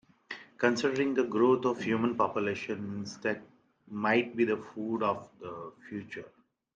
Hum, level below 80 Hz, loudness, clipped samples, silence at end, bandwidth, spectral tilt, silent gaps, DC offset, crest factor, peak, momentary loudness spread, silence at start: none; -76 dBFS; -30 LUFS; under 0.1%; 0.5 s; 8 kHz; -5.5 dB/octave; none; under 0.1%; 20 dB; -12 dBFS; 17 LU; 0.3 s